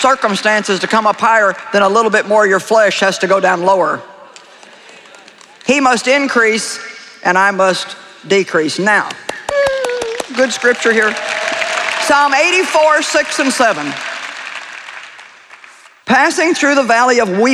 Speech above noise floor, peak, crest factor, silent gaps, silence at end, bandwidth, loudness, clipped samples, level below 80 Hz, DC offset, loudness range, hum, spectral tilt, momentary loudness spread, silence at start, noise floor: 29 dB; 0 dBFS; 12 dB; none; 0 s; 14 kHz; -13 LUFS; under 0.1%; -58 dBFS; under 0.1%; 4 LU; none; -3 dB/octave; 13 LU; 0 s; -41 dBFS